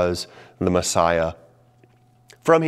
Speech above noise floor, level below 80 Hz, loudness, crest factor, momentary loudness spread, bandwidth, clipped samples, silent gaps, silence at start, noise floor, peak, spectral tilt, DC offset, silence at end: 34 dB; -48 dBFS; -22 LUFS; 20 dB; 10 LU; 15 kHz; under 0.1%; none; 0 s; -56 dBFS; -2 dBFS; -4.5 dB/octave; under 0.1%; 0 s